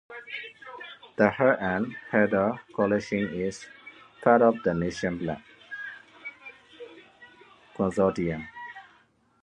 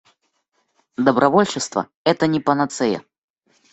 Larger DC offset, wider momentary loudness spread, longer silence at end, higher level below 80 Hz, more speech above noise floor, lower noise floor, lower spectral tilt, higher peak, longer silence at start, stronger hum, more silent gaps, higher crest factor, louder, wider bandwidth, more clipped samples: neither; first, 24 LU vs 9 LU; about the same, 0.6 s vs 0.7 s; about the same, -58 dBFS vs -60 dBFS; second, 37 dB vs 50 dB; second, -63 dBFS vs -69 dBFS; first, -6.5 dB/octave vs -5 dB/octave; about the same, -4 dBFS vs -2 dBFS; second, 0.1 s vs 1 s; neither; second, none vs 1.95-2.05 s; about the same, 24 dB vs 20 dB; second, -26 LUFS vs -19 LUFS; first, 9.8 kHz vs 8.4 kHz; neither